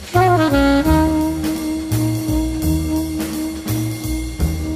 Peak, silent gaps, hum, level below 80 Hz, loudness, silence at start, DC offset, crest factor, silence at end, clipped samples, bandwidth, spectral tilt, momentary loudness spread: -2 dBFS; none; none; -26 dBFS; -18 LUFS; 0 s; under 0.1%; 14 dB; 0 s; under 0.1%; 15.5 kHz; -6 dB/octave; 9 LU